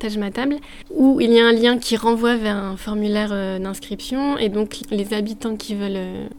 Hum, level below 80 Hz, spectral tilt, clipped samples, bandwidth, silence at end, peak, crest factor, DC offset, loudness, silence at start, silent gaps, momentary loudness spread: none; -44 dBFS; -5 dB/octave; under 0.1%; 17.5 kHz; 0 s; -2 dBFS; 18 dB; under 0.1%; -20 LUFS; 0 s; none; 13 LU